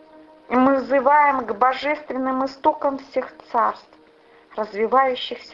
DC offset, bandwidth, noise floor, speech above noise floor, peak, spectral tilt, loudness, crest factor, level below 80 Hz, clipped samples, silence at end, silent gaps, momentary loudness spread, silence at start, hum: under 0.1%; 7.4 kHz; -52 dBFS; 31 dB; -4 dBFS; -5.5 dB/octave; -21 LUFS; 18 dB; -60 dBFS; under 0.1%; 0.05 s; none; 12 LU; 0.5 s; none